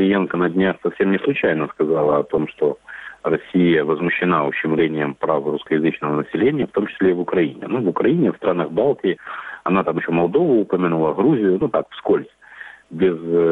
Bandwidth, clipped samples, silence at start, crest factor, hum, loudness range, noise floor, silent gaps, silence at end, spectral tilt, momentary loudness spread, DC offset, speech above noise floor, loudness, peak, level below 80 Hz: 4 kHz; under 0.1%; 0 s; 16 dB; none; 1 LU; -40 dBFS; none; 0 s; -9 dB/octave; 6 LU; under 0.1%; 22 dB; -19 LUFS; -4 dBFS; -56 dBFS